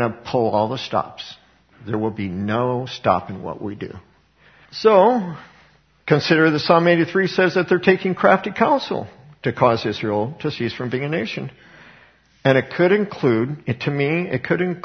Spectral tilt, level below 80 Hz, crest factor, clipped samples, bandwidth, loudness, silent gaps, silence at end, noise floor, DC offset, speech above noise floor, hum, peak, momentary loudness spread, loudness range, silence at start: -7 dB/octave; -58 dBFS; 20 dB; under 0.1%; 6.6 kHz; -19 LUFS; none; 0 s; -54 dBFS; under 0.1%; 35 dB; none; 0 dBFS; 15 LU; 7 LU; 0 s